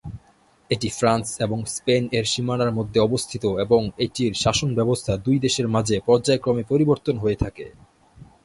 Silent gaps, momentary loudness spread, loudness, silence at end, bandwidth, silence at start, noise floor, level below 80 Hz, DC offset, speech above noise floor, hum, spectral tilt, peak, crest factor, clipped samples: none; 6 LU; -22 LUFS; 0.2 s; 11.5 kHz; 0.05 s; -57 dBFS; -44 dBFS; under 0.1%; 36 dB; none; -5 dB/octave; -4 dBFS; 18 dB; under 0.1%